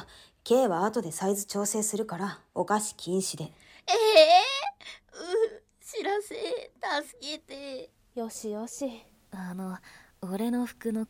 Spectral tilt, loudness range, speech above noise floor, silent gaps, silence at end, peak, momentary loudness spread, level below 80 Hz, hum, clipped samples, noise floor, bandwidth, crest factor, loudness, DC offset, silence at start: -3 dB/octave; 12 LU; 20 dB; none; 0.05 s; -8 dBFS; 20 LU; -68 dBFS; none; under 0.1%; -48 dBFS; 17 kHz; 20 dB; -28 LUFS; under 0.1%; 0 s